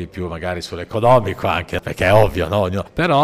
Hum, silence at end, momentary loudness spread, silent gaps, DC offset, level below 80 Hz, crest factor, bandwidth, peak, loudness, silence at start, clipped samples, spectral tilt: none; 0 s; 11 LU; none; under 0.1%; -38 dBFS; 14 dB; 15.5 kHz; -2 dBFS; -18 LUFS; 0 s; under 0.1%; -6.5 dB/octave